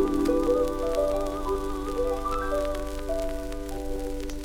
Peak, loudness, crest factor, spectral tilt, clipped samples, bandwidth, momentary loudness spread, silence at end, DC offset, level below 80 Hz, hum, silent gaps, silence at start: -12 dBFS; -29 LUFS; 14 dB; -6 dB/octave; under 0.1%; 18 kHz; 10 LU; 0 s; under 0.1%; -34 dBFS; 50 Hz at -40 dBFS; none; 0 s